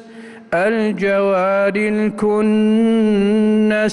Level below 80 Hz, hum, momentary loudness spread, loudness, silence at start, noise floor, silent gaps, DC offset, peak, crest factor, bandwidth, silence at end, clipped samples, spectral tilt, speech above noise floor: -52 dBFS; none; 4 LU; -16 LUFS; 0 s; -37 dBFS; none; under 0.1%; -8 dBFS; 8 dB; 11 kHz; 0 s; under 0.1%; -7 dB/octave; 22 dB